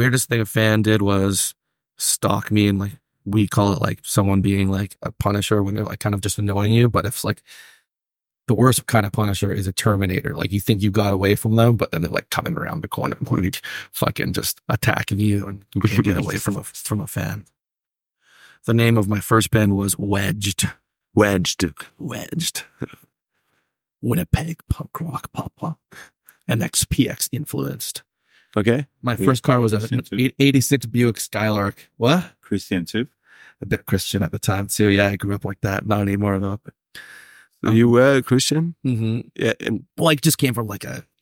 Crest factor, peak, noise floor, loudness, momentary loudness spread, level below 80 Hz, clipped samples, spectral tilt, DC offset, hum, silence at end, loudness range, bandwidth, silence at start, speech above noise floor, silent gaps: 20 dB; -2 dBFS; -89 dBFS; -20 LUFS; 12 LU; -44 dBFS; under 0.1%; -5 dB/octave; under 0.1%; none; 0.2 s; 5 LU; 17.5 kHz; 0 s; 69 dB; none